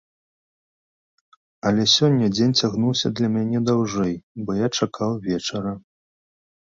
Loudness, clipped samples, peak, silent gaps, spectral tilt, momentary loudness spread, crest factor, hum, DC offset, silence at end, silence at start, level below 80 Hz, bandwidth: -21 LUFS; under 0.1%; -4 dBFS; 4.23-4.35 s; -5 dB/octave; 11 LU; 18 dB; none; under 0.1%; 0.85 s; 1.65 s; -56 dBFS; 7.6 kHz